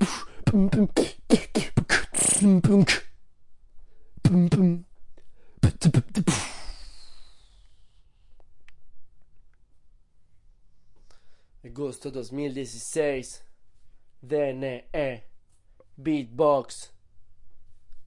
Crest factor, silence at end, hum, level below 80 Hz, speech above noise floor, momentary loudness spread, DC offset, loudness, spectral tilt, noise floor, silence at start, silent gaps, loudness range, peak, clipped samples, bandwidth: 22 dB; 0 s; none; -46 dBFS; 31 dB; 17 LU; under 0.1%; -24 LUFS; -5 dB/octave; -55 dBFS; 0 s; none; 14 LU; -4 dBFS; under 0.1%; 11.5 kHz